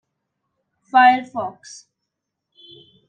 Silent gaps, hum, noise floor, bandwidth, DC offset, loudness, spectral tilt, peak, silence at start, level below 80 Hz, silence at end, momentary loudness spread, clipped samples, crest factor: none; none; -80 dBFS; 9 kHz; under 0.1%; -17 LUFS; -3 dB/octave; -2 dBFS; 0.95 s; -78 dBFS; 1.6 s; 18 LU; under 0.1%; 20 dB